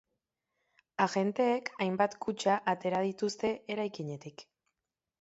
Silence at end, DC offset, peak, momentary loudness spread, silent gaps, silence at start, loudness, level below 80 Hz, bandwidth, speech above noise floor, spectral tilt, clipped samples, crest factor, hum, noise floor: 0.8 s; under 0.1%; -12 dBFS; 12 LU; none; 1 s; -32 LUFS; -76 dBFS; 8.2 kHz; 58 dB; -5 dB/octave; under 0.1%; 20 dB; none; -90 dBFS